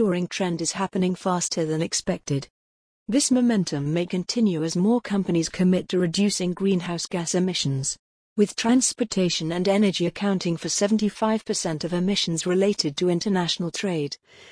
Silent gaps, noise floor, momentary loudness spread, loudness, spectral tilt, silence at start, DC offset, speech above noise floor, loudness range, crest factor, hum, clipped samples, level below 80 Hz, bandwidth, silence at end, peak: 2.50-3.06 s, 7.99-8.36 s; under -90 dBFS; 6 LU; -24 LUFS; -4.5 dB/octave; 0 s; under 0.1%; over 67 dB; 2 LU; 16 dB; none; under 0.1%; -58 dBFS; 10.5 kHz; 0.05 s; -8 dBFS